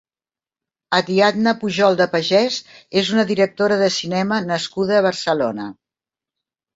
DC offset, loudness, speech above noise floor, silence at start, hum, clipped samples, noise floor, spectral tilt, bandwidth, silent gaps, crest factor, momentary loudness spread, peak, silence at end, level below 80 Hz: under 0.1%; -18 LUFS; over 72 dB; 0.9 s; none; under 0.1%; under -90 dBFS; -4.5 dB/octave; 8 kHz; none; 16 dB; 7 LU; -2 dBFS; 1.05 s; -62 dBFS